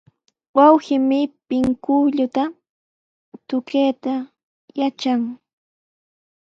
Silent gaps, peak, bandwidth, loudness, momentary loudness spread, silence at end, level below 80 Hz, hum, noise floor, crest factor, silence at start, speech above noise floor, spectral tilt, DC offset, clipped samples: 2.69-3.32 s, 4.44-4.68 s; 0 dBFS; 7.6 kHz; -19 LUFS; 13 LU; 1.15 s; -58 dBFS; none; under -90 dBFS; 20 dB; 0.55 s; over 72 dB; -6 dB/octave; under 0.1%; under 0.1%